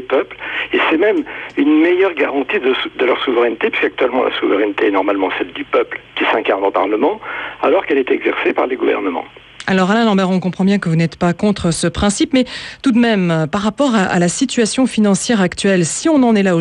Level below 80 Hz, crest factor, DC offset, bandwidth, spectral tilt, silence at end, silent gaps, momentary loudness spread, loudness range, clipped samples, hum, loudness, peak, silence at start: -44 dBFS; 12 dB; under 0.1%; 11.5 kHz; -5 dB/octave; 0 s; none; 6 LU; 2 LU; under 0.1%; none; -15 LUFS; -4 dBFS; 0 s